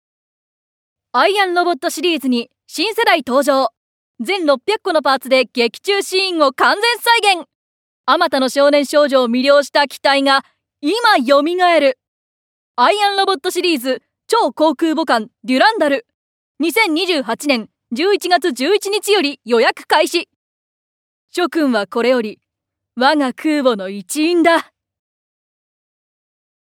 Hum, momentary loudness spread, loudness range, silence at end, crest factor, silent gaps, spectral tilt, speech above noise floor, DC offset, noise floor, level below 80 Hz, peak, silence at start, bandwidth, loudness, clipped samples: none; 8 LU; 4 LU; 2.1 s; 16 dB; 3.77-4.14 s, 7.55-8.04 s, 12.08-12.74 s, 16.14-16.55 s, 20.36-21.28 s; -2.5 dB/octave; 65 dB; under 0.1%; -80 dBFS; -72 dBFS; 0 dBFS; 1.15 s; 17.5 kHz; -15 LUFS; under 0.1%